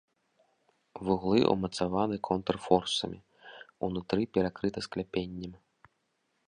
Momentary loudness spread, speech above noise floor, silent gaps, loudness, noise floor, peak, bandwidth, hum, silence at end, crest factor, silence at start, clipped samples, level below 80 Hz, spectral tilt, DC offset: 19 LU; 47 dB; none; -31 LUFS; -77 dBFS; -8 dBFS; 10.5 kHz; none; 0.9 s; 24 dB; 0.95 s; under 0.1%; -58 dBFS; -5.5 dB/octave; under 0.1%